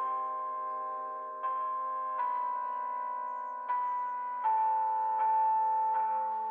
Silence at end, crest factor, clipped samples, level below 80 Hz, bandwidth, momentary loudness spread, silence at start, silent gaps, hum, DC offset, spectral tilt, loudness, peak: 0 s; 10 dB; under 0.1%; under -90 dBFS; 3.5 kHz; 9 LU; 0 s; none; none; under 0.1%; -4 dB/octave; -32 LUFS; -22 dBFS